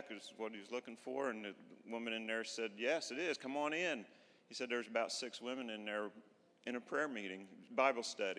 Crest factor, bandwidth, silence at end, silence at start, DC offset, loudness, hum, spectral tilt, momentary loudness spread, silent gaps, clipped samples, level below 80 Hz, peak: 24 dB; 11 kHz; 0 s; 0 s; under 0.1%; -42 LUFS; none; -2.5 dB/octave; 12 LU; none; under 0.1%; under -90 dBFS; -20 dBFS